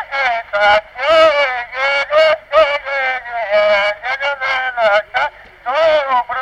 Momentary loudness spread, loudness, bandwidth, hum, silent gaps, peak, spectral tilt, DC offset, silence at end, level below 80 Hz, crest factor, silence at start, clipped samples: 7 LU; -14 LUFS; 9.2 kHz; none; none; -2 dBFS; -2 dB/octave; under 0.1%; 0 s; -50 dBFS; 12 dB; 0 s; under 0.1%